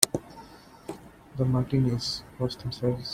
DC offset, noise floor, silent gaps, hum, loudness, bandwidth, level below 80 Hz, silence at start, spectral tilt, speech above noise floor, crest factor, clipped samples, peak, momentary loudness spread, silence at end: under 0.1%; -49 dBFS; none; none; -28 LUFS; 16.5 kHz; -52 dBFS; 0 s; -4.5 dB/octave; 22 dB; 30 dB; under 0.1%; 0 dBFS; 21 LU; 0 s